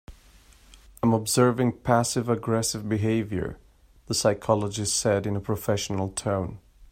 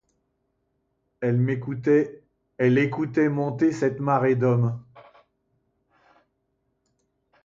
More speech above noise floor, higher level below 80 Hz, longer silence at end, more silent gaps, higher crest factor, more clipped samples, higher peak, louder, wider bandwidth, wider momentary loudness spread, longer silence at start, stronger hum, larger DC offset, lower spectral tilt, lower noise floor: second, 29 dB vs 52 dB; first, -52 dBFS vs -64 dBFS; second, 0.05 s vs 2.45 s; neither; about the same, 20 dB vs 18 dB; neither; about the same, -6 dBFS vs -8 dBFS; about the same, -25 LUFS vs -23 LUFS; first, 16 kHz vs 7.6 kHz; about the same, 7 LU vs 6 LU; second, 0.1 s vs 1.2 s; neither; neither; second, -5 dB/octave vs -8.5 dB/octave; second, -54 dBFS vs -74 dBFS